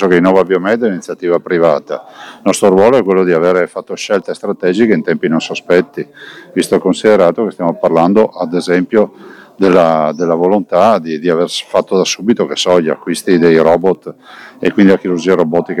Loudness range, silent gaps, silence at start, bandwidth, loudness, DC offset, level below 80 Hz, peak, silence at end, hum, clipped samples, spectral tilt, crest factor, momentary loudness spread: 1 LU; none; 0 s; 13.5 kHz; -12 LUFS; under 0.1%; -52 dBFS; 0 dBFS; 0 s; none; under 0.1%; -5.5 dB/octave; 12 dB; 9 LU